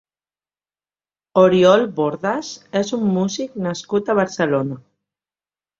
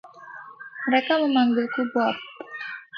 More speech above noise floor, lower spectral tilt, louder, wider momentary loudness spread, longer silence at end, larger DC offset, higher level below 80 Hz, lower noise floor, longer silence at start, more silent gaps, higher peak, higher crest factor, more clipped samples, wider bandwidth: first, over 72 dB vs 21 dB; about the same, -5.5 dB/octave vs -6 dB/octave; first, -19 LUFS vs -23 LUFS; second, 12 LU vs 20 LU; first, 1 s vs 0 s; neither; first, -62 dBFS vs -76 dBFS; first, under -90 dBFS vs -43 dBFS; first, 1.35 s vs 0.05 s; neither; first, -2 dBFS vs -10 dBFS; about the same, 18 dB vs 16 dB; neither; first, 7.6 kHz vs 6 kHz